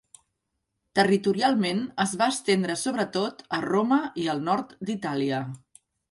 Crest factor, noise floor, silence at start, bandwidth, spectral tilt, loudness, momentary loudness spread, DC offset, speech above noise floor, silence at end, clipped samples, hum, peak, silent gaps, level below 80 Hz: 20 dB; -80 dBFS; 0.95 s; 11.5 kHz; -4.5 dB/octave; -26 LUFS; 8 LU; under 0.1%; 55 dB; 0.55 s; under 0.1%; none; -6 dBFS; none; -68 dBFS